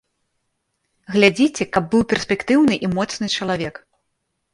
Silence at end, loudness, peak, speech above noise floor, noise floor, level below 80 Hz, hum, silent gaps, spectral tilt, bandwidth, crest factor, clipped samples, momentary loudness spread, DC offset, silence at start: 0.8 s; -19 LUFS; 0 dBFS; 55 dB; -74 dBFS; -52 dBFS; none; none; -5 dB/octave; 11.5 kHz; 20 dB; under 0.1%; 8 LU; under 0.1%; 1.1 s